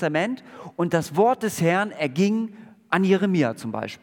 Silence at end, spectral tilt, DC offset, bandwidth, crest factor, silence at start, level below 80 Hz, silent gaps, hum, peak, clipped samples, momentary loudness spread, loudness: 0.05 s; -6 dB/octave; under 0.1%; 18 kHz; 18 dB; 0 s; -68 dBFS; none; none; -4 dBFS; under 0.1%; 11 LU; -23 LUFS